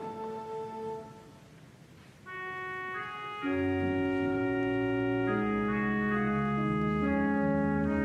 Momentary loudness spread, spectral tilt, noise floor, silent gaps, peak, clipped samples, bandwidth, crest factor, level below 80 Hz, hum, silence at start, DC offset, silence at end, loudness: 11 LU; -8 dB/octave; -54 dBFS; none; -18 dBFS; under 0.1%; 8.4 kHz; 14 dB; -54 dBFS; none; 0 s; under 0.1%; 0 s; -31 LUFS